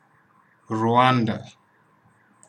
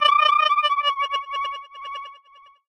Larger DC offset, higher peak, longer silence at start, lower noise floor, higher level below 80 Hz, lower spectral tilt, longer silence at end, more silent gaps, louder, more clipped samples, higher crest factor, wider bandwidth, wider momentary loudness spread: neither; about the same, -4 dBFS vs -4 dBFS; first, 0.7 s vs 0 s; first, -60 dBFS vs -52 dBFS; second, -72 dBFS vs -64 dBFS; first, -7 dB/octave vs 2 dB/octave; first, 1 s vs 0.55 s; neither; about the same, -21 LUFS vs -20 LUFS; neither; about the same, 20 dB vs 18 dB; about the same, 9.8 kHz vs 10.5 kHz; second, 14 LU vs 18 LU